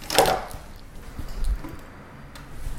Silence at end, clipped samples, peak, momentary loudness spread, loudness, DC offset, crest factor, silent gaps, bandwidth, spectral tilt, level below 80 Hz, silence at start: 0 s; under 0.1%; 0 dBFS; 23 LU; -26 LUFS; under 0.1%; 28 dB; none; 17 kHz; -3 dB/octave; -34 dBFS; 0 s